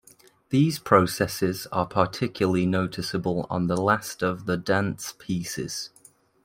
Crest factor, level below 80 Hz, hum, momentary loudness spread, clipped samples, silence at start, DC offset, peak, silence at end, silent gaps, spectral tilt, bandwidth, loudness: 24 dB; -58 dBFS; none; 10 LU; under 0.1%; 0.5 s; under 0.1%; -2 dBFS; 0.6 s; none; -5.5 dB/octave; 16.5 kHz; -25 LUFS